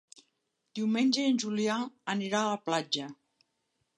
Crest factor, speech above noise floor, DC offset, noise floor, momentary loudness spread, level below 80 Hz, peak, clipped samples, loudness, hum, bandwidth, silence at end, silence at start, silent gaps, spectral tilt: 16 dB; 50 dB; under 0.1%; -80 dBFS; 8 LU; -82 dBFS; -16 dBFS; under 0.1%; -30 LUFS; none; 11 kHz; 0.85 s; 0.75 s; none; -4 dB/octave